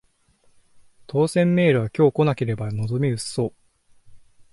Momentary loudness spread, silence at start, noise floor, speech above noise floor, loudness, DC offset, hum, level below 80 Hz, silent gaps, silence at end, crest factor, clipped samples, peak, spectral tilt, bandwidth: 9 LU; 1.15 s; -60 dBFS; 40 dB; -22 LUFS; under 0.1%; none; -56 dBFS; none; 0.35 s; 16 dB; under 0.1%; -6 dBFS; -7 dB/octave; 11.5 kHz